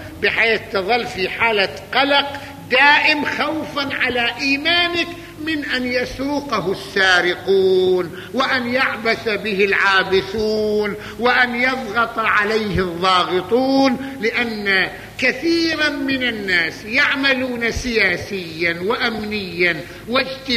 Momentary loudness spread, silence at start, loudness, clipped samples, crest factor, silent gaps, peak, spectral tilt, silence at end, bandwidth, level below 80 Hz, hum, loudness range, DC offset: 7 LU; 0 s; -17 LUFS; under 0.1%; 16 dB; none; -2 dBFS; -4 dB/octave; 0 s; 15 kHz; -44 dBFS; none; 2 LU; under 0.1%